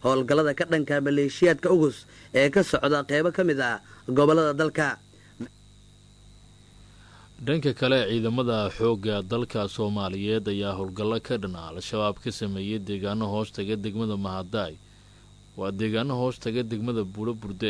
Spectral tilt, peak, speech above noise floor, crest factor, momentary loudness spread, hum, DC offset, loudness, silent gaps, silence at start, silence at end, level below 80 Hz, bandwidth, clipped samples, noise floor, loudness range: -6 dB/octave; -8 dBFS; 27 dB; 18 dB; 11 LU; 50 Hz at -50 dBFS; under 0.1%; -26 LUFS; none; 0 s; 0 s; -56 dBFS; 11 kHz; under 0.1%; -53 dBFS; 8 LU